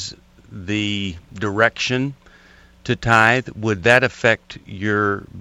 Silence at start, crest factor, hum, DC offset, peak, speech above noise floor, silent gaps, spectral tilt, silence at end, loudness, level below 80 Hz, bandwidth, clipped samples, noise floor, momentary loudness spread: 0 s; 20 dB; none; under 0.1%; 0 dBFS; 30 dB; none; -5 dB/octave; 0 s; -19 LUFS; -48 dBFS; 13 kHz; under 0.1%; -49 dBFS; 14 LU